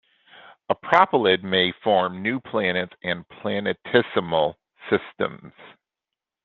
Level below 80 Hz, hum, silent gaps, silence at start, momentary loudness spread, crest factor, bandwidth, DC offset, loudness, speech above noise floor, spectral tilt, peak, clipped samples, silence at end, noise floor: -64 dBFS; none; none; 0.7 s; 11 LU; 22 dB; 7 kHz; under 0.1%; -23 LUFS; 64 dB; -6.5 dB/octave; -2 dBFS; under 0.1%; 0.75 s; -87 dBFS